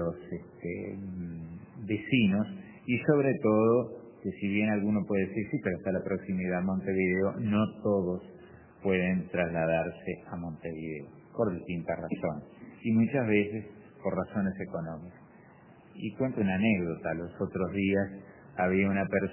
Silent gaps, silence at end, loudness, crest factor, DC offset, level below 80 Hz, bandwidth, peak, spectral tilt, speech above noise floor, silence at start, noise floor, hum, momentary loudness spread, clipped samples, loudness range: none; 0 s; -31 LUFS; 20 dB; under 0.1%; -56 dBFS; 3.2 kHz; -12 dBFS; -6.5 dB/octave; 26 dB; 0 s; -55 dBFS; none; 14 LU; under 0.1%; 5 LU